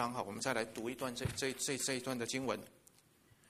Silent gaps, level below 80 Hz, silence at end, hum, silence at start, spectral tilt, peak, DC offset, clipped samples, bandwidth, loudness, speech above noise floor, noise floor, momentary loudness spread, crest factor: none; -64 dBFS; 0.8 s; none; 0 s; -3 dB/octave; -20 dBFS; under 0.1%; under 0.1%; 15.5 kHz; -39 LUFS; 28 dB; -68 dBFS; 5 LU; 20 dB